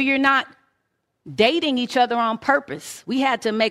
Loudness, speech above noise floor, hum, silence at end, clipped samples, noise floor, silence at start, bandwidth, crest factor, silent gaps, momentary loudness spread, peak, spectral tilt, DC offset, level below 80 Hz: -20 LUFS; 53 dB; none; 0 s; under 0.1%; -73 dBFS; 0 s; 15.5 kHz; 20 dB; none; 15 LU; -2 dBFS; -3.5 dB/octave; under 0.1%; -64 dBFS